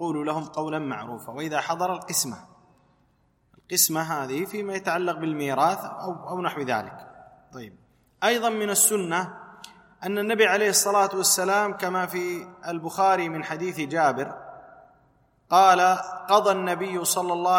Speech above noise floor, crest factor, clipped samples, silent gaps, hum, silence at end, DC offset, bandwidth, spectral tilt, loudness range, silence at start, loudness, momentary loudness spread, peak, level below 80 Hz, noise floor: 41 dB; 20 dB; under 0.1%; none; none; 0 s; under 0.1%; 16.5 kHz; -2.5 dB/octave; 6 LU; 0 s; -24 LUFS; 15 LU; -4 dBFS; -70 dBFS; -65 dBFS